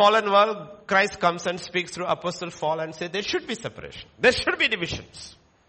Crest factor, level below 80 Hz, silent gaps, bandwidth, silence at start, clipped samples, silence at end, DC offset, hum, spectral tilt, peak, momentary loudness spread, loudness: 20 dB; -54 dBFS; none; 8.8 kHz; 0 s; under 0.1%; 0.35 s; under 0.1%; none; -3.5 dB/octave; -4 dBFS; 16 LU; -24 LUFS